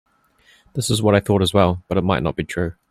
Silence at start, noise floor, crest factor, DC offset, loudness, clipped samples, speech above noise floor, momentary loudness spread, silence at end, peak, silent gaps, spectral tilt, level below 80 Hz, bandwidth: 0.75 s; -56 dBFS; 18 dB; under 0.1%; -19 LUFS; under 0.1%; 38 dB; 9 LU; 0.2 s; -2 dBFS; none; -5.5 dB/octave; -44 dBFS; 15.5 kHz